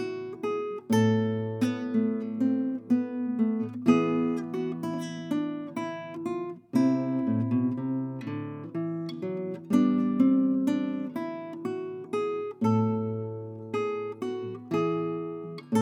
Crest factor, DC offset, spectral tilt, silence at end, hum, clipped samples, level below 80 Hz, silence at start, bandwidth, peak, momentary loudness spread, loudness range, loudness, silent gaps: 18 dB; under 0.1%; -7.5 dB/octave; 0 s; none; under 0.1%; -78 dBFS; 0 s; 13.5 kHz; -10 dBFS; 11 LU; 3 LU; -29 LUFS; none